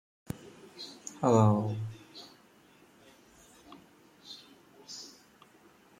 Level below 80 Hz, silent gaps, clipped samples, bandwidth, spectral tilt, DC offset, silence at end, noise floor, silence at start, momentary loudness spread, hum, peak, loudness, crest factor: -70 dBFS; none; under 0.1%; 15 kHz; -7 dB/octave; under 0.1%; 0.95 s; -61 dBFS; 0.35 s; 30 LU; none; -10 dBFS; -31 LUFS; 24 dB